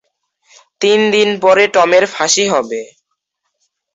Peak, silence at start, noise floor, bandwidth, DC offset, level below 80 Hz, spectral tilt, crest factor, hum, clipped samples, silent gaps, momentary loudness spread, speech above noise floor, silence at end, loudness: 0 dBFS; 0.8 s; -71 dBFS; 8 kHz; under 0.1%; -60 dBFS; -2.5 dB/octave; 14 dB; none; under 0.1%; none; 8 LU; 59 dB; 1.1 s; -12 LUFS